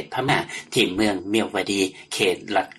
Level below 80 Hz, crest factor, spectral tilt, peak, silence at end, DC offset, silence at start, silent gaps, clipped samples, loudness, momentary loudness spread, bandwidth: -56 dBFS; 18 dB; -3.5 dB/octave; -4 dBFS; 0.05 s; under 0.1%; 0 s; none; under 0.1%; -23 LUFS; 4 LU; 13 kHz